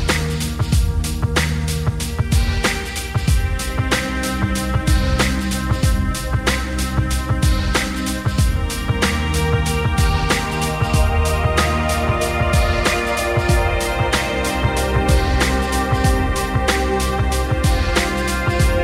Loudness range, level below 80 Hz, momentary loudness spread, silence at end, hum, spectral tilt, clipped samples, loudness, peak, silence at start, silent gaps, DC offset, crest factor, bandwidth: 2 LU; -22 dBFS; 4 LU; 0 s; none; -5 dB/octave; under 0.1%; -19 LUFS; -4 dBFS; 0 s; none; under 0.1%; 14 dB; 16 kHz